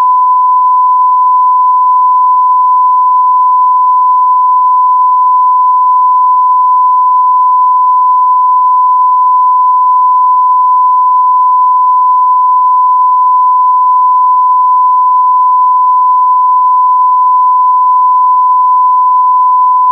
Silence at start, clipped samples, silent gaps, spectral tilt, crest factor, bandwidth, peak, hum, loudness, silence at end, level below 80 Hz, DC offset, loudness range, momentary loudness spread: 0 s; under 0.1%; none; -4 dB/octave; 4 dB; 1.2 kHz; -2 dBFS; none; -7 LUFS; 0 s; under -90 dBFS; under 0.1%; 0 LU; 0 LU